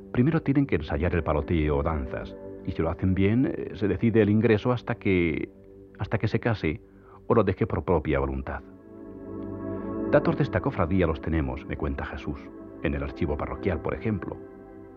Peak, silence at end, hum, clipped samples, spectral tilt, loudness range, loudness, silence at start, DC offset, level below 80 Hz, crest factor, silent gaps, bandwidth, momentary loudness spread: -8 dBFS; 0 s; none; under 0.1%; -9.5 dB/octave; 4 LU; -27 LUFS; 0 s; under 0.1%; -40 dBFS; 20 dB; none; 6.4 kHz; 15 LU